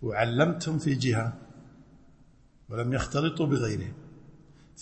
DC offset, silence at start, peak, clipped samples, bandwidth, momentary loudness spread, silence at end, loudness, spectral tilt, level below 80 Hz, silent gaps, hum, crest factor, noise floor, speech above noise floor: under 0.1%; 0 s; -10 dBFS; under 0.1%; 8.8 kHz; 14 LU; 0 s; -28 LUFS; -6 dB/octave; -52 dBFS; none; none; 20 dB; -57 dBFS; 30 dB